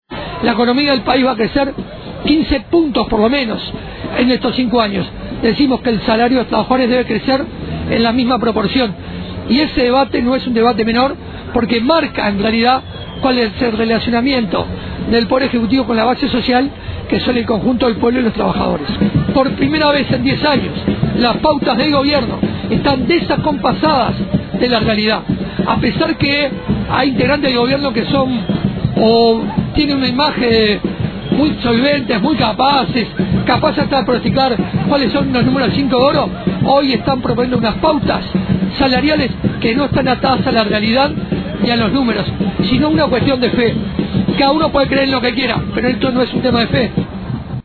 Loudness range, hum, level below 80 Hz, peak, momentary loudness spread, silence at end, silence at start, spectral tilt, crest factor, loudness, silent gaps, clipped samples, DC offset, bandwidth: 1 LU; none; -34 dBFS; 0 dBFS; 6 LU; 0.05 s; 0.1 s; -8.5 dB/octave; 14 dB; -14 LUFS; none; under 0.1%; under 0.1%; 4.6 kHz